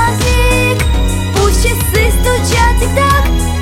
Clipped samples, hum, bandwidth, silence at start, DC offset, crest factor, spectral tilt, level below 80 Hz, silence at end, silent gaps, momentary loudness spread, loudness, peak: under 0.1%; none; 17 kHz; 0 s; under 0.1%; 10 dB; -4.5 dB/octave; -14 dBFS; 0 s; none; 3 LU; -12 LUFS; 0 dBFS